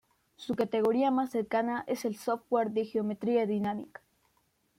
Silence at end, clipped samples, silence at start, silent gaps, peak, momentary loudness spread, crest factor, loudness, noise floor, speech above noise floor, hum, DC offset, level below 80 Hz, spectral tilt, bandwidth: 0.95 s; under 0.1%; 0.4 s; none; -16 dBFS; 8 LU; 16 dB; -31 LUFS; -73 dBFS; 43 dB; none; under 0.1%; -74 dBFS; -6.5 dB/octave; 16 kHz